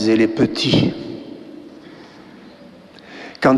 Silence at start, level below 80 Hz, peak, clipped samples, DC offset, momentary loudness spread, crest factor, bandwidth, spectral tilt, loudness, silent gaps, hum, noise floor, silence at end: 0 s; -48 dBFS; -2 dBFS; under 0.1%; under 0.1%; 25 LU; 18 dB; 11.5 kHz; -6 dB/octave; -17 LUFS; none; none; -42 dBFS; 0 s